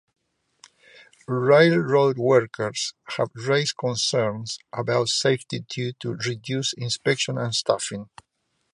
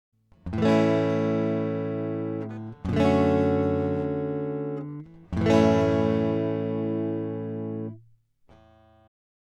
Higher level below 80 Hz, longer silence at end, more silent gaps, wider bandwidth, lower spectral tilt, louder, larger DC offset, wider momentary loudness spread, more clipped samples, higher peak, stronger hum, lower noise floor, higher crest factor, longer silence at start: second, -66 dBFS vs -54 dBFS; second, 0.7 s vs 1.5 s; neither; first, 11.5 kHz vs 9.4 kHz; second, -4 dB/octave vs -8 dB/octave; about the same, -23 LUFS vs -25 LUFS; neither; about the same, 11 LU vs 13 LU; neither; about the same, -4 dBFS vs -6 dBFS; neither; about the same, -57 dBFS vs -59 dBFS; about the same, 20 dB vs 20 dB; first, 1.3 s vs 0.45 s